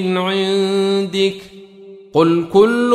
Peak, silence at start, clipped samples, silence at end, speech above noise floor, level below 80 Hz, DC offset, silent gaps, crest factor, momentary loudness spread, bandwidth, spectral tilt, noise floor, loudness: -2 dBFS; 0 s; under 0.1%; 0 s; 24 dB; -56 dBFS; under 0.1%; none; 14 dB; 7 LU; 12.5 kHz; -6 dB/octave; -39 dBFS; -16 LUFS